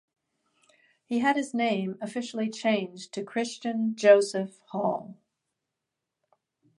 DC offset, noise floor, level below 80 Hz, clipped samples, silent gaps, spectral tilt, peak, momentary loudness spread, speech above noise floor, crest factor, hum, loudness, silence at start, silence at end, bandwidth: under 0.1%; -86 dBFS; -80 dBFS; under 0.1%; none; -5 dB/octave; -6 dBFS; 14 LU; 59 dB; 22 dB; none; -27 LUFS; 1.1 s; 1.65 s; 11.5 kHz